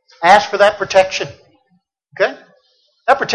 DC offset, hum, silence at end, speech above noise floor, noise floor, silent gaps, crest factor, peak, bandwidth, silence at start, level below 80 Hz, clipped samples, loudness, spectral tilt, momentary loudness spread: under 0.1%; none; 0 s; 49 dB; -62 dBFS; none; 16 dB; 0 dBFS; 11 kHz; 0.2 s; -54 dBFS; under 0.1%; -14 LUFS; -2.5 dB/octave; 12 LU